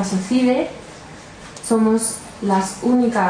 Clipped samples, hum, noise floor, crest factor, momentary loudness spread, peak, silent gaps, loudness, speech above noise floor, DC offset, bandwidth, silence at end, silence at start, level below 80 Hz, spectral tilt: under 0.1%; none; -38 dBFS; 14 dB; 20 LU; -6 dBFS; none; -19 LUFS; 20 dB; under 0.1%; 10.5 kHz; 0 s; 0 s; -52 dBFS; -5 dB/octave